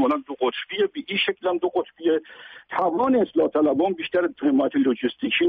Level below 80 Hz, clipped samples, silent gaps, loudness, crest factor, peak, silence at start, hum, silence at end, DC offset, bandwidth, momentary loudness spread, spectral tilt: -66 dBFS; under 0.1%; none; -23 LUFS; 12 dB; -10 dBFS; 0 s; none; 0 s; under 0.1%; 4.9 kHz; 6 LU; -2.5 dB/octave